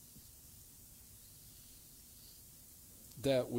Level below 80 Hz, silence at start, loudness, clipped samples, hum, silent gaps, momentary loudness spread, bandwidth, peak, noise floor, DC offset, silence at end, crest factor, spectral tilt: -66 dBFS; 0 s; -46 LUFS; under 0.1%; none; none; 17 LU; 17.5 kHz; -22 dBFS; -58 dBFS; under 0.1%; 0 s; 22 dB; -5 dB/octave